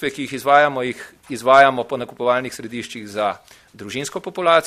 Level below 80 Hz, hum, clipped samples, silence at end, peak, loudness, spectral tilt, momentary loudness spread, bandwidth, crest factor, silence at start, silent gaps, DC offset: -62 dBFS; none; under 0.1%; 0 s; 0 dBFS; -18 LUFS; -4 dB/octave; 17 LU; 15 kHz; 18 dB; 0 s; none; under 0.1%